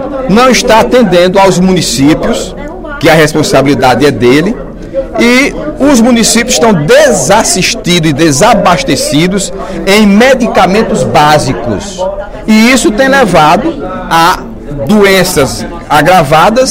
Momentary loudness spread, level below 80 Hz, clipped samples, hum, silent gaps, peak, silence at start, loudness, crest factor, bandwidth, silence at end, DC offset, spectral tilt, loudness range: 11 LU; -26 dBFS; 4%; none; none; 0 dBFS; 0 s; -6 LUFS; 6 dB; 17.5 kHz; 0 s; under 0.1%; -4 dB/octave; 2 LU